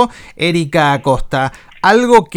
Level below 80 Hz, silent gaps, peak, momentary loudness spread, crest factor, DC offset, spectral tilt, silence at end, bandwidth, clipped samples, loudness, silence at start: -32 dBFS; none; 0 dBFS; 9 LU; 12 dB; under 0.1%; -5.5 dB/octave; 0.1 s; 17.5 kHz; 0.3%; -13 LUFS; 0 s